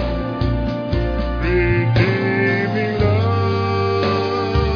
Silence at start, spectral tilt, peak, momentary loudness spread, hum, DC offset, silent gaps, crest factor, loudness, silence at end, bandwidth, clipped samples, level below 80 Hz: 0 s; -8 dB/octave; -2 dBFS; 5 LU; none; under 0.1%; none; 16 dB; -18 LUFS; 0 s; 5.4 kHz; under 0.1%; -28 dBFS